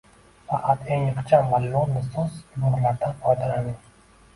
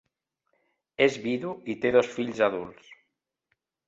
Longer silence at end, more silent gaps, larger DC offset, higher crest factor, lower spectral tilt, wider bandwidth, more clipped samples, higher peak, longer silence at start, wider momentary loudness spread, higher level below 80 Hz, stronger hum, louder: second, 0.6 s vs 0.95 s; neither; neither; about the same, 20 dB vs 22 dB; first, -8.5 dB/octave vs -5 dB/octave; first, 11.5 kHz vs 7.8 kHz; neither; about the same, -4 dBFS vs -6 dBFS; second, 0.5 s vs 1 s; second, 10 LU vs 13 LU; first, -50 dBFS vs -68 dBFS; neither; about the same, -24 LUFS vs -26 LUFS